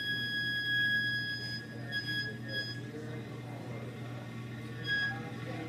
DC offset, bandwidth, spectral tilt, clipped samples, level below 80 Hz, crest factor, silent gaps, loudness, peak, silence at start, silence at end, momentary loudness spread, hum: under 0.1%; 15 kHz; -4.5 dB/octave; under 0.1%; -68 dBFS; 14 dB; none; -35 LUFS; -22 dBFS; 0 s; 0 s; 13 LU; none